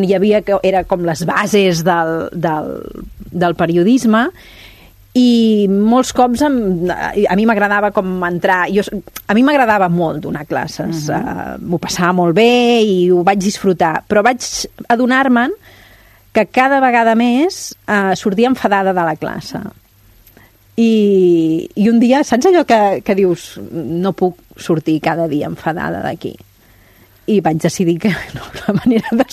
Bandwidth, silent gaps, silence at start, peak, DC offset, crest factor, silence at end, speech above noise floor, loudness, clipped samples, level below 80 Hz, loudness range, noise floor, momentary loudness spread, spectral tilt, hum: 13.5 kHz; none; 0 s; 0 dBFS; under 0.1%; 14 dB; 0.1 s; 34 dB; -14 LUFS; under 0.1%; -44 dBFS; 5 LU; -47 dBFS; 12 LU; -5.5 dB/octave; none